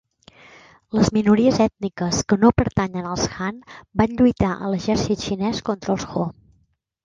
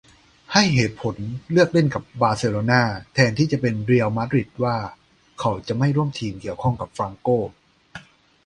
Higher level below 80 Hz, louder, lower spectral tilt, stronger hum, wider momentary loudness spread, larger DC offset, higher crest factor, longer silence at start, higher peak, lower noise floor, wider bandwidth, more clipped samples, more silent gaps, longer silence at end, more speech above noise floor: first, -40 dBFS vs -50 dBFS; about the same, -21 LUFS vs -21 LUFS; about the same, -5.5 dB/octave vs -6 dB/octave; neither; about the same, 10 LU vs 11 LU; neither; about the same, 18 dB vs 22 dB; first, 0.95 s vs 0.5 s; second, -4 dBFS vs 0 dBFS; first, -64 dBFS vs -44 dBFS; second, 9 kHz vs 10.5 kHz; neither; neither; first, 0.75 s vs 0.45 s; first, 44 dB vs 23 dB